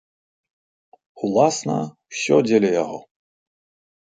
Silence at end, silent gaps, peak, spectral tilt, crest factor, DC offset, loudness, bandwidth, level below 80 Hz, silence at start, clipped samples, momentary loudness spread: 1.15 s; none; -2 dBFS; -5 dB/octave; 20 dB; under 0.1%; -20 LUFS; 9.4 kHz; -68 dBFS; 1.15 s; under 0.1%; 13 LU